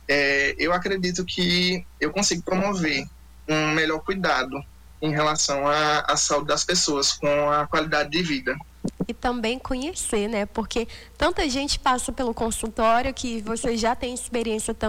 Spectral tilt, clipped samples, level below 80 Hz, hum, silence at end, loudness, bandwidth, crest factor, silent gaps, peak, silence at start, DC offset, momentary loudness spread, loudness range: -3 dB/octave; under 0.1%; -42 dBFS; none; 0 s; -23 LUFS; 19 kHz; 14 dB; none; -10 dBFS; 0.05 s; under 0.1%; 8 LU; 4 LU